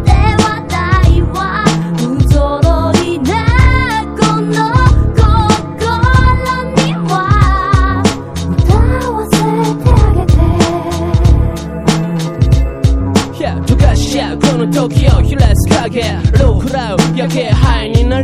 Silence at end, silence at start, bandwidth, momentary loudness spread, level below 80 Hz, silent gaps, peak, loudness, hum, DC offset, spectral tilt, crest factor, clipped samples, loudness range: 0 s; 0 s; 13.5 kHz; 5 LU; -14 dBFS; none; 0 dBFS; -12 LUFS; none; 0.3%; -6 dB/octave; 10 dB; 0.6%; 2 LU